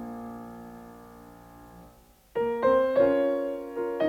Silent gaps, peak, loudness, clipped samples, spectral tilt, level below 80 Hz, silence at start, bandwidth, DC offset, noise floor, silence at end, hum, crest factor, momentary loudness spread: none; -12 dBFS; -26 LUFS; under 0.1%; -7 dB/octave; -60 dBFS; 0 s; 15 kHz; under 0.1%; -56 dBFS; 0 s; none; 16 dB; 24 LU